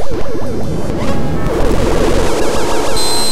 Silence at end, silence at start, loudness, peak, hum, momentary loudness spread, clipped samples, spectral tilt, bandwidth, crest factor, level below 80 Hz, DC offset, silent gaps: 0 s; 0 s; -16 LUFS; 0 dBFS; none; 7 LU; under 0.1%; -4.5 dB/octave; 15.5 kHz; 12 dB; -20 dBFS; 20%; none